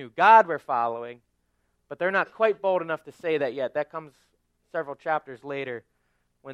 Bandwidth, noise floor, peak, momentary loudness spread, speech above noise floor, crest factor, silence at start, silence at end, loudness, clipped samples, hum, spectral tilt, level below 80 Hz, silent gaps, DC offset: 8 kHz; -72 dBFS; -4 dBFS; 19 LU; 47 dB; 22 dB; 0 s; 0 s; -25 LUFS; under 0.1%; 60 Hz at -65 dBFS; -5.5 dB/octave; -76 dBFS; none; under 0.1%